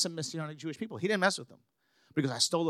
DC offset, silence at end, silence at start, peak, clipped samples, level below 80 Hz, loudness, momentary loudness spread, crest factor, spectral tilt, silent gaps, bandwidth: under 0.1%; 0 s; 0 s; -12 dBFS; under 0.1%; -84 dBFS; -32 LUFS; 11 LU; 22 dB; -3.5 dB/octave; none; 15.5 kHz